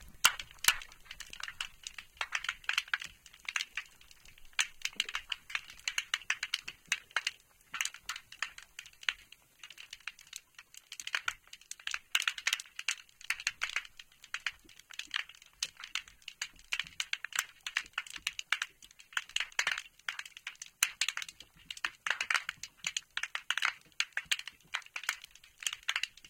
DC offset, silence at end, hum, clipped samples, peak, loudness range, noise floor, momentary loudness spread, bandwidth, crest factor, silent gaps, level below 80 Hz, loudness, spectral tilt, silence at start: under 0.1%; 0 s; none; under 0.1%; -6 dBFS; 5 LU; -59 dBFS; 16 LU; 17 kHz; 34 dB; none; -66 dBFS; -36 LUFS; 2.5 dB/octave; 0 s